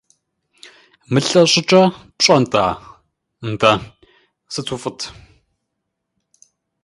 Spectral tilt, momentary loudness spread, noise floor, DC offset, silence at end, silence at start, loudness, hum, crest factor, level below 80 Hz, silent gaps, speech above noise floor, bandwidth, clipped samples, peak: -4 dB/octave; 17 LU; -76 dBFS; under 0.1%; 1.75 s; 1.1 s; -16 LUFS; none; 20 dB; -52 dBFS; none; 61 dB; 11.5 kHz; under 0.1%; 0 dBFS